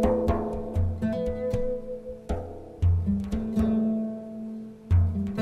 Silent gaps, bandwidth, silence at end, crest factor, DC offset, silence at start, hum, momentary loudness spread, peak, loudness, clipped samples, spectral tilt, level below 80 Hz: none; 9 kHz; 0 s; 18 dB; under 0.1%; 0 s; none; 13 LU; -10 dBFS; -28 LUFS; under 0.1%; -9.5 dB/octave; -36 dBFS